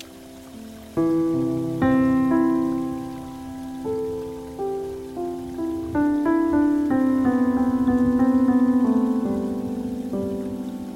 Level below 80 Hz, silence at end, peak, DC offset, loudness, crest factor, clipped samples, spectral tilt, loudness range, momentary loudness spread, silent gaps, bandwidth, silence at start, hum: -48 dBFS; 0 s; -10 dBFS; under 0.1%; -22 LUFS; 12 dB; under 0.1%; -8 dB/octave; 8 LU; 15 LU; none; 13.5 kHz; 0 s; none